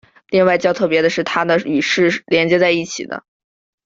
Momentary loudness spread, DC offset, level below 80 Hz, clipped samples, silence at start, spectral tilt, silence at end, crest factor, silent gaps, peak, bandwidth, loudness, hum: 11 LU; under 0.1%; -58 dBFS; under 0.1%; 0.3 s; -4.5 dB/octave; 0.65 s; 14 dB; none; -2 dBFS; 7.8 kHz; -16 LUFS; none